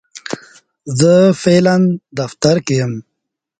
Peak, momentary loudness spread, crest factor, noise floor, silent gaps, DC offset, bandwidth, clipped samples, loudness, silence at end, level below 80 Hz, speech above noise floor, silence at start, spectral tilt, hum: 0 dBFS; 17 LU; 14 dB; -76 dBFS; none; under 0.1%; 9.4 kHz; under 0.1%; -13 LUFS; 0.6 s; -52 dBFS; 63 dB; 0.15 s; -6 dB/octave; none